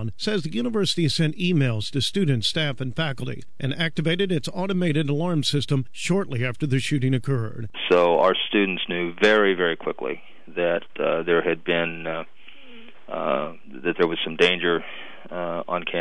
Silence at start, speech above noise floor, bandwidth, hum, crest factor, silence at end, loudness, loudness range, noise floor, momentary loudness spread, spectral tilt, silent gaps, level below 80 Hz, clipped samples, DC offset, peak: 0 s; 24 dB; 11 kHz; none; 18 dB; 0 s; -23 LUFS; 4 LU; -48 dBFS; 12 LU; -5.5 dB/octave; none; -58 dBFS; under 0.1%; 2%; -6 dBFS